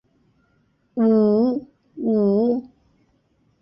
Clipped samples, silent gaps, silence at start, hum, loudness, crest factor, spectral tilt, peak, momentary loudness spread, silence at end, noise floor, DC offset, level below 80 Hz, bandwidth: under 0.1%; none; 0.95 s; none; -20 LUFS; 14 dB; -12 dB/octave; -8 dBFS; 12 LU; 0.95 s; -64 dBFS; under 0.1%; -64 dBFS; 5.6 kHz